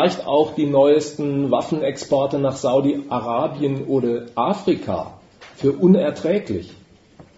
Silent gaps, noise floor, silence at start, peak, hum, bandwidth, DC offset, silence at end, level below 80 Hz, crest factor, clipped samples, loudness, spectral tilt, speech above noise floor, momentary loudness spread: none; -48 dBFS; 0 s; -4 dBFS; none; 8 kHz; under 0.1%; 0.15 s; -58 dBFS; 16 dB; under 0.1%; -20 LUFS; -7 dB/octave; 29 dB; 8 LU